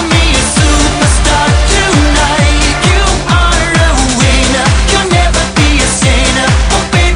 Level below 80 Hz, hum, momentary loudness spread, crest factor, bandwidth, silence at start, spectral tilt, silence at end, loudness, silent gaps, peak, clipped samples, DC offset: -12 dBFS; none; 1 LU; 8 dB; 11 kHz; 0 s; -3.5 dB/octave; 0 s; -9 LUFS; none; 0 dBFS; 0.2%; under 0.1%